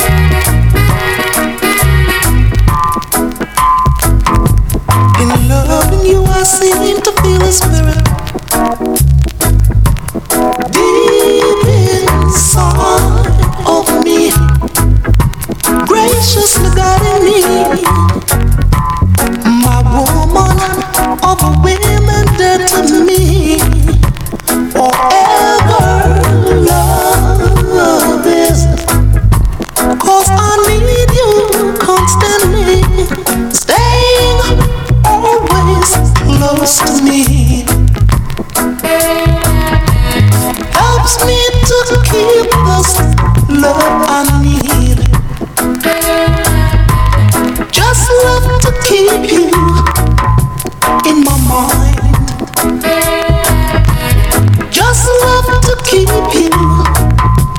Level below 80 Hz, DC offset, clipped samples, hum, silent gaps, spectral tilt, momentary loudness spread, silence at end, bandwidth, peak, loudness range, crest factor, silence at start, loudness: -14 dBFS; under 0.1%; 0.2%; none; none; -5 dB/octave; 4 LU; 0 s; over 20 kHz; 0 dBFS; 2 LU; 8 dB; 0 s; -9 LUFS